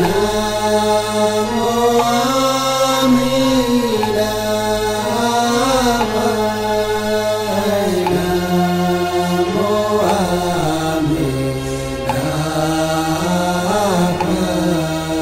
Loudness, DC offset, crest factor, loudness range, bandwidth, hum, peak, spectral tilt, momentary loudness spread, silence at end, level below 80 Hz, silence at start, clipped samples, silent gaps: -16 LUFS; under 0.1%; 12 dB; 3 LU; 16 kHz; none; -4 dBFS; -5 dB/octave; 4 LU; 0 s; -38 dBFS; 0 s; under 0.1%; none